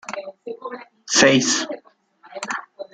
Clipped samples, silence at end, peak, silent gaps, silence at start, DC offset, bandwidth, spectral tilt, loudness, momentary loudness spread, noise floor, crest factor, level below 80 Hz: under 0.1%; 0.1 s; -2 dBFS; none; 0.1 s; under 0.1%; 10.5 kHz; -2.5 dB/octave; -18 LUFS; 22 LU; -53 dBFS; 22 dB; -64 dBFS